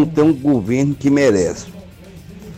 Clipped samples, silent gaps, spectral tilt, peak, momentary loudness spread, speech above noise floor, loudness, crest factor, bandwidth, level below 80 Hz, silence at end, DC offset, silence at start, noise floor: under 0.1%; none; -6.5 dB/octave; -6 dBFS; 18 LU; 23 dB; -16 LUFS; 12 dB; 13.5 kHz; -46 dBFS; 0 s; under 0.1%; 0 s; -38 dBFS